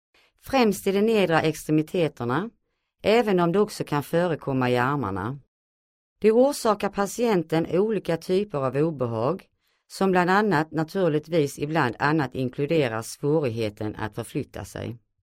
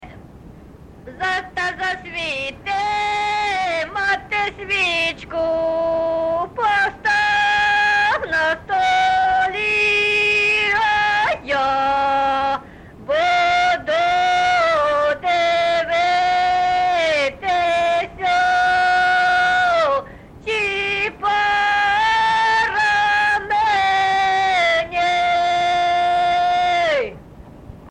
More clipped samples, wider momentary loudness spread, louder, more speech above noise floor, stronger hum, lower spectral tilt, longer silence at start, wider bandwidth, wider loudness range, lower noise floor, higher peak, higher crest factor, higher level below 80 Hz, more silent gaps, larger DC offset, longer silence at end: neither; first, 11 LU vs 7 LU; second, -24 LUFS vs -17 LUFS; first, over 66 dB vs 19 dB; neither; first, -6 dB/octave vs -2.5 dB/octave; first, 0.45 s vs 0 s; first, 16 kHz vs 10.5 kHz; about the same, 2 LU vs 4 LU; first, under -90 dBFS vs -41 dBFS; about the same, -6 dBFS vs -8 dBFS; first, 18 dB vs 10 dB; second, -56 dBFS vs -48 dBFS; first, 5.48-6.16 s vs none; neither; first, 0.3 s vs 0 s